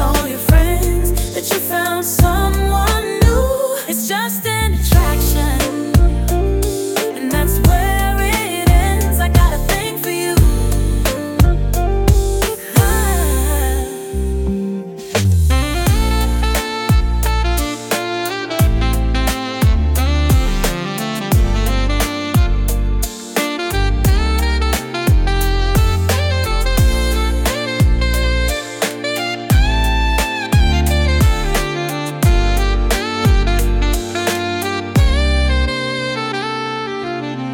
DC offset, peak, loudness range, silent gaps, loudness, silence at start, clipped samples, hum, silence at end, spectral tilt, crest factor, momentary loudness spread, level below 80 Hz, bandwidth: under 0.1%; 0 dBFS; 2 LU; none; -16 LUFS; 0 s; under 0.1%; none; 0 s; -5 dB/octave; 14 dB; 6 LU; -18 dBFS; 19 kHz